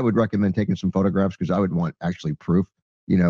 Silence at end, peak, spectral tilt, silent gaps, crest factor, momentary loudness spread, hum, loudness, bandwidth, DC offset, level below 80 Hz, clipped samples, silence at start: 0 s; -6 dBFS; -9 dB/octave; 2.82-3.07 s; 14 dB; 7 LU; none; -23 LUFS; 7 kHz; under 0.1%; -52 dBFS; under 0.1%; 0 s